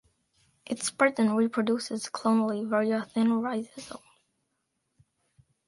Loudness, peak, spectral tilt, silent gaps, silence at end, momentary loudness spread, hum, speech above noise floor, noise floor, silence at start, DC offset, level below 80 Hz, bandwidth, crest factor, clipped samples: -27 LUFS; -8 dBFS; -4.5 dB/octave; none; 1.7 s; 14 LU; none; 52 dB; -79 dBFS; 0.7 s; under 0.1%; -74 dBFS; 11.5 kHz; 22 dB; under 0.1%